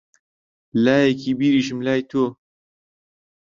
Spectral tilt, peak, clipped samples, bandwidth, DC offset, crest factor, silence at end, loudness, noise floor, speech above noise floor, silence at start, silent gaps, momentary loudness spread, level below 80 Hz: -6 dB/octave; -4 dBFS; under 0.1%; 7.4 kHz; under 0.1%; 18 dB; 1.1 s; -20 LUFS; under -90 dBFS; over 71 dB; 0.75 s; none; 7 LU; -62 dBFS